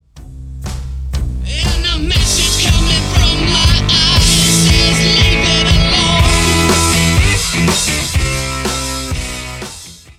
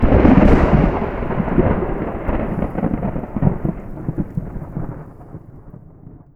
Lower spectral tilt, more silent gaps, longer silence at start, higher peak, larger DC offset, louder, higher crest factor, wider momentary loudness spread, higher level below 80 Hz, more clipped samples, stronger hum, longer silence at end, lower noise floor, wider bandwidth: second, -3 dB/octave vs -10 dB/octave; neither; first, 0.15 s vs 0 s; about the same, 0 dBFS vs 0 dBFS; neither; first, -11 LUFS vs -19 LUFS; second, 12 dB vs 18 dB; second, 15 LU vs 19 LU; first, -18 dBFS vs -24 dBFS; neither; neither; about the same, 0.2 s vs 0.2 s; second, -33 dBFS vs -41 dBFS; first, 16.5 kHz vs 6.4 kHz